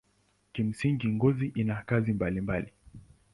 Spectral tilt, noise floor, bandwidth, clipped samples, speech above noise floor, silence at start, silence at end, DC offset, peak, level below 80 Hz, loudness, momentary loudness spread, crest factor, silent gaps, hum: -8.5 dB/octave; -70 dBFS; 11.5 kHz; under 0.1%; 41 dB; 0.55 s; 0.35 s; under 0.1%; -12 dBFS; -54 dBFS; -30 LUFS; 7 LU; 18 dB; none; none